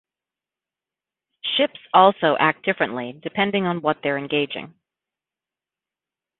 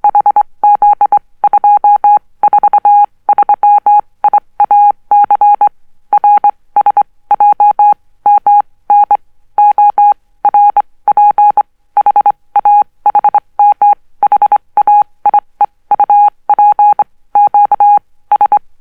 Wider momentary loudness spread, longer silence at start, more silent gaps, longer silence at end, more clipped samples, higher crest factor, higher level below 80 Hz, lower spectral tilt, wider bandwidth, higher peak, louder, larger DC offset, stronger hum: first, 13 LU vs 5 LU; first, 1.45 s vs 0.05 s; neither; first, 1.7 s vs 0.25 s; neither; first, 22 dB vs 8 dB; second, -68 dBFS vs -52 dBFS; first, -9.5 dB/octave vs -6 dB/octave; first, 4.3 kHz vs 3 kHz; about the same, -2 dBFS vs 0 dBFS; second, -21 LUFS vs -9 LUFS; neither; neither